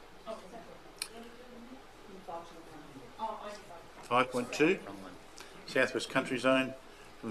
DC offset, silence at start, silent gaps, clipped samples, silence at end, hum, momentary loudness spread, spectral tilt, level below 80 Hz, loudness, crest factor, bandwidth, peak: under 0.1%; 0 s; none; under 0.1%; 0 s; none; 21 LU; -4 dB/octave; -66 dBFS; -33 LUFS; 22 dB; 14 kHz; -14 dBFS